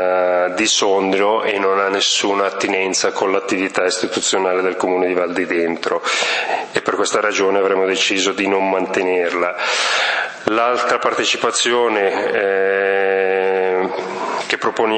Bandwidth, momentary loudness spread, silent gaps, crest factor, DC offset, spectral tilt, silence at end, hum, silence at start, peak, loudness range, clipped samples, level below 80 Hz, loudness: 8.8 kHz; 4 LU; none; 16 dB; under 0.1%; -2 dB/octave; 0 s; none; 0 s; 0 dBFS; 2 LU; under 0.1%; -68 dBFS; -17 LUFS